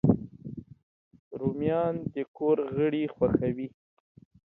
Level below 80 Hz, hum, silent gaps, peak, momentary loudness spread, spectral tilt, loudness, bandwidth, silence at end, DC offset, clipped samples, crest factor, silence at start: -54 dBFS; none; 0.83-1.11 s, 1.19-1.31 s, 2.28-2.34 s; -8 dBFS; 16 LU; -11.5 dB/octave; -29 LUFS; 4 kHz; 0.85 s; under 0.1%; under 0.1%; 20 dB; 0.05 s